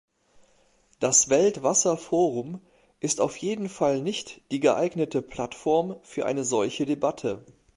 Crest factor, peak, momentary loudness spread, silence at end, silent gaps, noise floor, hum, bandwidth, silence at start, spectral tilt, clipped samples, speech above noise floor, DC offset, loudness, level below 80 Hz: 18 dB; -8 dBFS; 13 LU; 0.35 s; none; -63 dBFS; none; 11.5 kHz; 1 s; -3.5 dB/octave; under 0.1%; 38 dB; under 0.1%; -25 LUFS; -62 dBFS